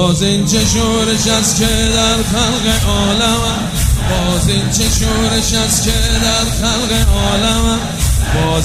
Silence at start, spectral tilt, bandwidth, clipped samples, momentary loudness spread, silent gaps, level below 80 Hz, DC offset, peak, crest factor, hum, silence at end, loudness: 0 s; -3.5 dB/octave; 16 kHz; under 0.1%; 3 LU; none; -20 dBFS; under 0.1%; 0 dBFS; 12 dB; none; 0 s; -13 LUFS